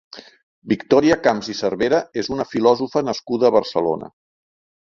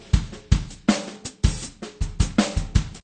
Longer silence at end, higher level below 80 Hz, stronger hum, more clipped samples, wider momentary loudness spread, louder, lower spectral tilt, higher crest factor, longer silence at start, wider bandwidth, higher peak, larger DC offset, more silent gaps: first, 0.9 s vs 0.05 s; second, -54 dBFS vs -28 dBFS; neither; neither; about the same, 8 LU vs 10 LU; first, -19 LUFS vs -25 LUFS; about the same, -5.5 dB/octave vs -5.5 dB/octave; about the same, 18 dB vs 20 dB; first, 0.15 s vs 0 s; second, 7.4 kHz vs 9.6 kHz; about the same, -2 dBFS vs -2 dBFS; neither; first, 0.43-0.62 s vs none